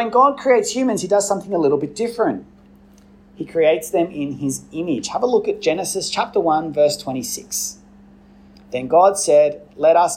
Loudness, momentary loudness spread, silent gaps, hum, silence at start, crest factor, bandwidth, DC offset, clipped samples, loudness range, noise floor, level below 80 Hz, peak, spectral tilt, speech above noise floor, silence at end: -19 LUFS; 11 LU; none; none; 0 s; 16 dB; 16 kHz; under 0.1%; under 0.1%; 3 LU; -48 dBFS; -56 dBFS; -2 dBFS; -4 dB/octave; 30 dB; 0 s